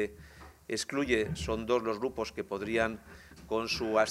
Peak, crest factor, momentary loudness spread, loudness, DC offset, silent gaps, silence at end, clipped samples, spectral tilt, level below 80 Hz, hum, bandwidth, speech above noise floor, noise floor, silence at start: -12 dBFS; 20 dB; 21 LU; -32 LUFS; under 0.1%; none; 0 s; under 0.1%; -4.5 dB/octave; -54 dBFS; none; 16 kHz; 20 dB; -52 dBFS; 0 s